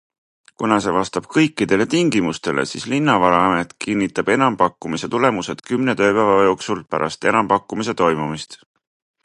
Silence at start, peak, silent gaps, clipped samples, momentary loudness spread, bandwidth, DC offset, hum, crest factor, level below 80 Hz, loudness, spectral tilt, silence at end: 0.6 s; 0 dBFS; none; under 0.1%; 9 LU; 11.5 kHz; under 0.1%; none; 18 dB; -52 dBFS; -18 LUFS; -5 dB/octave; 0.7 s